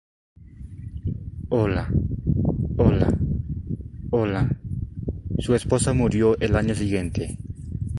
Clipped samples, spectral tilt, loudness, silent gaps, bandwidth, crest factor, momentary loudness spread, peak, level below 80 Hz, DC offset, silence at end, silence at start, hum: under 0.1%; -7 dB/octave; -24 LUFS; none; 11.5 kHz; 18 dB; 13 LU; -4 dBFS; -34 dBFS; under 0.1%; 0 s; 0.4 s; none